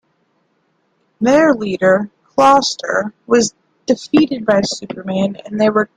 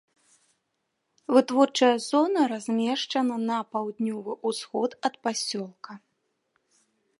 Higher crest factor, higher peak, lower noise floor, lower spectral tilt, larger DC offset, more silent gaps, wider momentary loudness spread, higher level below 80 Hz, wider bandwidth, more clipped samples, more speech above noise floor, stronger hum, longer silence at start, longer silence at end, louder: about the same, 16 dB vs 20 dB; first, 0 dBFS vs -6 dBFS; second, -63 dBFS vs -79 dBFS; about the same, -4.5 dB/octave vs -3.5 dB/octave; neither; neither; about the same, 10 LU vs 11 LU; first, -54 dBFS vs -84 dBFS; about the same, 11 kHz vs 11.5 kHz; neither; second, 49 dB vs 53 dB; neither; about the same, 1.2 s vs 1.3 s; second, 0.1 s vs 1.25 s; first, -15 LUFS vs -26 LUFS